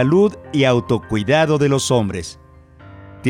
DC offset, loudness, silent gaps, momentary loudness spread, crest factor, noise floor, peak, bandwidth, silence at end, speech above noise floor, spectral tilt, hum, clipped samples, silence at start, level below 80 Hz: under 0.1%; -17 LUFS; none; 9 LU; 12 dB; -43 dBFS; -4 dBFS; 16.5 kHz; 0 s; 26 dB; -5.5 dB/octave; none; under 0.1%; 0 s; -46 dBFS